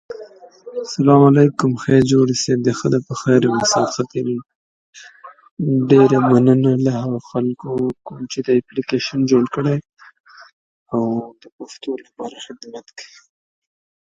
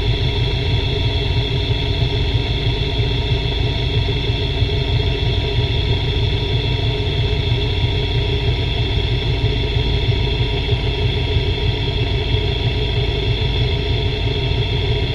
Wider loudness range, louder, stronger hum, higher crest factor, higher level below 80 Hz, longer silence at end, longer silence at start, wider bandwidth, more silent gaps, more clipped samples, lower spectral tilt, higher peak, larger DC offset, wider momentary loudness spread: first, 13 LU vs 0 LU; about the same, -17 LUFS vs -19 LUFS; neither; about the same, 18 dB vs 14 dB; second, -56 dBFS vs -22 dBFS; first, 1 s vs 0 s; about the same, 0.1 s vs 0 s; first, 9.2 kHz vs 7.4 kHz; first, 4.55-4.93 s, 5.51-5.57 s, 10.20-10.24 s, 10.53-10.86 s, 11.52-11.59 s vs none; neither; about the same, -6 dB/octave vs -6.5 dB/octave; first, 0 dBFS vs -4 dBFS; neither; first, 21 LU vs 1 LU